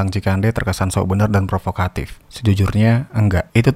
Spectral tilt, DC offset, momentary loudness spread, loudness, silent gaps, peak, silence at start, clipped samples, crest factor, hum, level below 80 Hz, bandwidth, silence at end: -7 dB/octave; under 0.1%; 7 LU; -18 LUFS; none; 0 dBFS; 0 s; under 0.1%; 16 dB; none; -36 dBFS; 15 kHz; 0 s